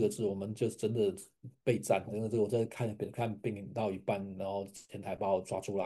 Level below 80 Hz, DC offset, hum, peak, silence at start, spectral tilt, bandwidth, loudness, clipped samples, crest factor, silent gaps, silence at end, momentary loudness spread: -72 dBFS; under 0.1%; none; -16 dBFS; 0 s; -6.5 dB/octave; 12.5 kHz; -35 LUFS; under 0.1%; 18 dB; none; 0 s; 8 LU